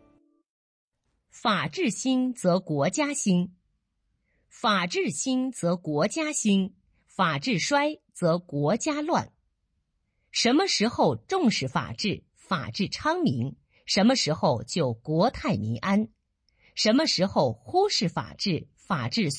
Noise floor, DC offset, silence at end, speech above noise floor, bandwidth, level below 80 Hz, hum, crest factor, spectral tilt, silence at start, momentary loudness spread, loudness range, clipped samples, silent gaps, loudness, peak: -75 dBFS; under 0.1%; 0 s; 50 dB; 10.5 kHz; -60 dBFS; none; 16 dB; -4.5 dB/octave; 1.35 s; 8 LU; 2 LU; under 0.1%; none; -26 LUFS; -10 dBFS